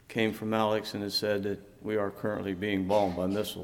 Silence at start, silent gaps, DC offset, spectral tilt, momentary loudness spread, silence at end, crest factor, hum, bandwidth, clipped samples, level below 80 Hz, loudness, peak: 0.1 s; none; under 0.1%; -5.5 dB/octave; 6 LU; 0 s; 18 dB; none; 18 kHz; under 0.1%; -62 dBFS; -30 LUFS; -12 dBFS